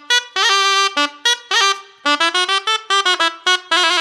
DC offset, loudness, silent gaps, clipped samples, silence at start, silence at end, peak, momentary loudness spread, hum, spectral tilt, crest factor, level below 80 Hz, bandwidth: under 0.1%; -15 LUFS; none; under 0.1%; 0.1 s; 0 s; 0 dBFS; 4 LU; none; 3 dB/octave; 16 dB; -78 dBFS; 15.5 kHz